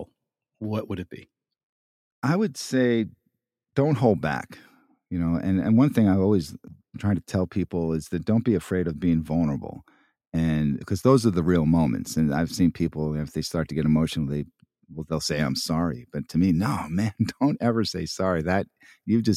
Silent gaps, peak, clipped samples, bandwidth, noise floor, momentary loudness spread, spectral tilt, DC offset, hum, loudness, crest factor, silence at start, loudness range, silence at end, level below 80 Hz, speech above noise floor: 1.63-2.22 s, 10.27-10.32 s; -6 dBFS; under 0.1%; 15 kHz; -78 dBFS; 13 LU; -6.5 dB/octave; under 0.1%; none; -25 LUFS; 20 dB; 0 s; 3 LU; 0 s; -48 dBFS; 54 dB